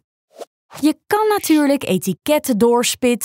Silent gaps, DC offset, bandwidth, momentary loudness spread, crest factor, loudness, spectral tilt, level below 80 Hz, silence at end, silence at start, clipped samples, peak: 0.47-0.69 s; under 0.1%; 16.5 kHz; 5 LU; 14 dB; -17 LUFS; -4 dB/octave; -58 dBFS; 0 s; 0.4 s; under 0.1%; -4 dBFS